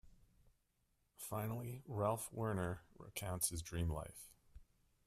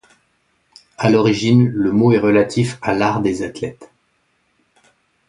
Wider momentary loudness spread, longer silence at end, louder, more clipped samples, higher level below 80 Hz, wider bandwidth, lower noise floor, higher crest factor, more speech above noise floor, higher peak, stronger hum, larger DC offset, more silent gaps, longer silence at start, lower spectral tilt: first, 13 LU vs 10 LU; second, 0.45 s vs 1.45 s; second, -43 LUFS vs -16 LUFS; neither; second, -60 dBFS vs -52 dBFS; first, 15.5 kHz vs 11.5 kHz; first, -81 dBFS vs -64 dBFS; about the same, 22 dB vs 18 dB; second, 38 dB vs 49 dB; second, -22 dBFS vs 0 dBFS; neither; neither; neither; second, 0.05 s vs 1 s; second, -5 dB/octave vs -7 dB/octave